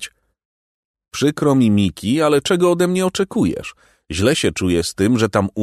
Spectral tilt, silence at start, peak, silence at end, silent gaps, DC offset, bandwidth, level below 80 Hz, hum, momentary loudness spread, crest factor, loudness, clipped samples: -5.5 dB/octave; 0 s; -2 dBFS; 0 s; 0.45-0.94 s; under 0.1%; 13.5 kHz; -44 dBFS; none; 10 LU; 16 dB; -17 LUFS; under 0.1%